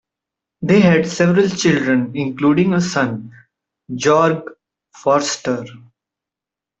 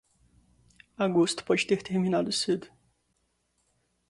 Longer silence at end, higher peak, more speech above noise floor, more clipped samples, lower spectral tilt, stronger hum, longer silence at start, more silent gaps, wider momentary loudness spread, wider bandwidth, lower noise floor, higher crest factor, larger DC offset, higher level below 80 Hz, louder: second, 1.05 s vs 1.45 s; first, -2 dBFS vs -12 dBFS; first, 71 dB vs 48 dB; neither; about the same, -5.5 dB/octave vs -4.5 dB/octave; neither; second, 0.6 s vs 1 s; neither; first, 13 LU vs 5 LU; second, 8.2 kHz vs 11.5 kHz; first, -87 dBFS vs -74 dBFS; about the same, 16 dB vs 20 dB; neither; first, -56 dBFS vs -68 dBFS; first, -16 LUFS vs -27 LUFS